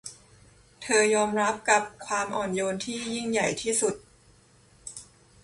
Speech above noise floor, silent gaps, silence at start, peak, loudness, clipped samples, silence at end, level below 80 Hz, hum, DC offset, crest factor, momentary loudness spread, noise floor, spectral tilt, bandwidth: 32 dB; none; 0.05 s; -6 dBFS; -26 LUFS; under 0.1%; 0.4 s; -62 dBFS; none; under 0.1%; 22 dB; 19 LU; -58 dBFS; -2.5 dB/octave; 11.5 kHz